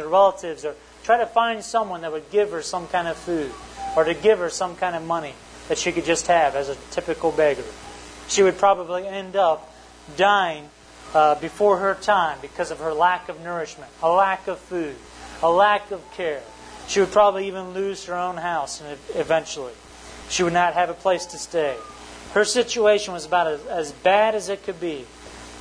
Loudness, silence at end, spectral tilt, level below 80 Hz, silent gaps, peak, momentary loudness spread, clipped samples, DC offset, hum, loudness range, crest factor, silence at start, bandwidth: -22 LUFS; 0 s; -3 dB/octave; -52 dBFS; none; -4 dBFS; 16 LU; under 0.1%; under 0.1%; 60 Hz at -55 dBFS; 3 LU; 18 dB; 0 s; 10.5 kHz